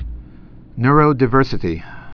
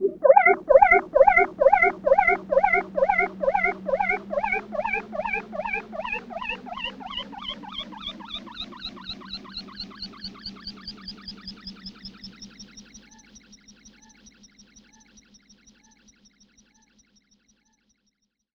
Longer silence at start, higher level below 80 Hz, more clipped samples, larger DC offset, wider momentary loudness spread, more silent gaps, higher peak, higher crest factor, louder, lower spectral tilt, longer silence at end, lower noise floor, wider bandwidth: about the same, 0 s vs 0 s; first, -32 dBFS vs -52 dBFS; neither; neither; about the same, 21 LU vs 22 LU; neither; about the same, 0 dBFS vs -2 dBFS; second, 18 dB vs 24 dB; first, -16 LUFS vs -22 LUFS; first, -9 dB/octave vs -4 dB/octave; second, 0.05 s vs 5.75 s; second, -39 dBFS vs -75 dBFS; second, 5.4 kHz vs 6.8 kHz